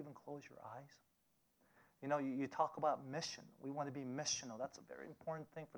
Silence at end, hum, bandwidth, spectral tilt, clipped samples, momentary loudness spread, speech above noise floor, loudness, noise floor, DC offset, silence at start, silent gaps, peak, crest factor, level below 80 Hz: 0 s; none; over 20 kHz; -3.5 dB/octave; under 0.1%; 15 LU; 36 dB; -44 LUFS; -80 dBFS; under 0.1%; 0 s; none; -24 dBFS; 22 dB; -86 dBFS